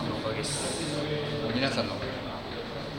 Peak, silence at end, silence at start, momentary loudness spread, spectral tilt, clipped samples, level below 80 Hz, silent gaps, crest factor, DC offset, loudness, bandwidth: -12 dBFS; 0 s; 0 s; 8 LU; -4 dB/octave; under 0.1%; -52 dBFS; none; 20 dB; under 0.1%; -31 LUFS; 17.5 kHz